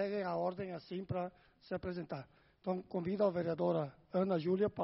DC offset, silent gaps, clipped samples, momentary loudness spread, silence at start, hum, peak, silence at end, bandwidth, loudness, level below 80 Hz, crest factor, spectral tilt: under 0.1%; none; under 0.1%; 11 LU; 0 s; none; -20 dBFS; 0 s; 5.8 kHz; -38 LUFS; -68 dBFS; 18 dB; -7 dB/octave